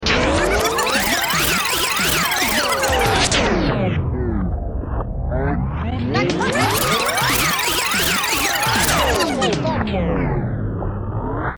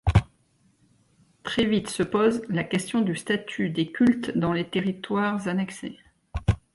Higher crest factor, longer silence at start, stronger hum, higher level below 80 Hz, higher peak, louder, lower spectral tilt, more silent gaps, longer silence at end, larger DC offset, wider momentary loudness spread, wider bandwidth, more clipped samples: second, 16 dB vs 22 dB; about the same, 0 s vs 0.05 s; neither; first, -30 dBFS vs -40 dBFS; about the same, -4 dBFS vs -4 dBFS; first, -18 LUFS vs -26 LUFS; second, -3.5 dB/octave vs -6 dB/octave; neither; second, 0 s vs 0.2 s; neither; about the same, 8 LU vs 7 LU; first, over 20 kHz vs 11.5 kHz; neither